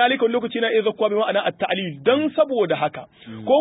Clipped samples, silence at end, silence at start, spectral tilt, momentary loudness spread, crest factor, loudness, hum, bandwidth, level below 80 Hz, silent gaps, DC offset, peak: under 0.1%; 0 s; 0 s; -10 dB/octave; 7 LU; 16 dB; -21 LUFS; none; 4 kHz; -66 dBFS; none; under 0.1%; -4 dBFS